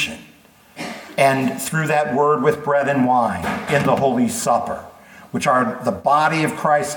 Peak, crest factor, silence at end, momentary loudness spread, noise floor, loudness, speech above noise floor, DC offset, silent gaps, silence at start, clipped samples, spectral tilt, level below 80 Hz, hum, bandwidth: -2 dBFS; 18 dB; 0 s; 12 LU; -49 dBFS; -18 LUFS; 31 dB; under 0.1%; none; 0 s; under 0.1%; -5 dB/octave; -54 dBFS; none; 19 kHz